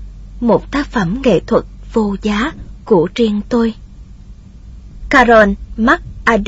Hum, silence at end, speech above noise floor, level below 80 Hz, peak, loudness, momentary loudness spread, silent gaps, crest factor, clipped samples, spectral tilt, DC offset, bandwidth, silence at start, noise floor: none; 0 s; 23 dB; -32 dBFS; 0 dBFS; -14 LUFS; 10 LU; none; 14 dB; under 0.1%; -6 dB/octave; under 0.1%; 8 kHz; 0 s; -36 dBFS